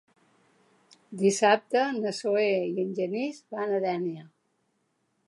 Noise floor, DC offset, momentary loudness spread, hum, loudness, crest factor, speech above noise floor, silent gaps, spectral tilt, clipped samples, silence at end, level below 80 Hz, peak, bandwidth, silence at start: -74 dBFS; under 0.1%; 11 LU; none; -27 LUFS; 20 dB; 47 dB; none; -4.5 dB/octave; under 0.1%; 1 s; -84 dBFS; -8 dBFS; 11.5 kHz; 1.1 s